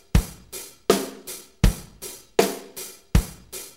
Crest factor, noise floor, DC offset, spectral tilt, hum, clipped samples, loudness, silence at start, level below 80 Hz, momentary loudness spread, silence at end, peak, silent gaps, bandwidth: 22 dB; -41 dBFS; under 0.1%; -5 dB/octave; none; under 0.1%; -25 LUFS; 0.15 s; -30 dBFS; 14 LU; 0.1 s; -4 dBFS; none; 16 kHz